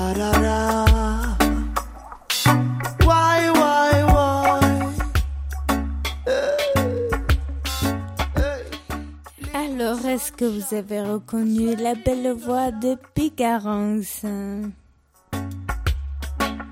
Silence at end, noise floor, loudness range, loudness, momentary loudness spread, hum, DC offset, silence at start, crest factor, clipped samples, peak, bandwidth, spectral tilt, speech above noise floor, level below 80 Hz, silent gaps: 0 s; -57 dBFS; 8 LU; -22 LUFS; 13 LU; none; under 0.1%; 0 s; 16 dB; under 0.1%; -4 dBFS; 16.5 kHz; -5.5 dB/octave; 34 dB; -28 dBFS; none